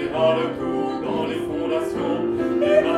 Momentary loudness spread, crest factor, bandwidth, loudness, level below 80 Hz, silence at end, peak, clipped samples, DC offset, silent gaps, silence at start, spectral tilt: 6 LU; 16 dB; 12.5 kHz; -23 LUFS; -52 dBFS; 0 s; -4 dBFS; under 0.1%; under 0.1%; none; 0 s; -6.5 dB/octave